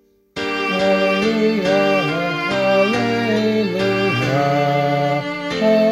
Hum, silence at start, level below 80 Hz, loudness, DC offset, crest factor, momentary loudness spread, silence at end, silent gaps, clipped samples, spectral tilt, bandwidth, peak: none; 0.35 s; -54 dBFS; -17 LUFS; under 0.1%; 14 dB; 5 LU; 0 s; none; under 0.1%; -6 dB/octave; 15.5 kHz; -4 dBFS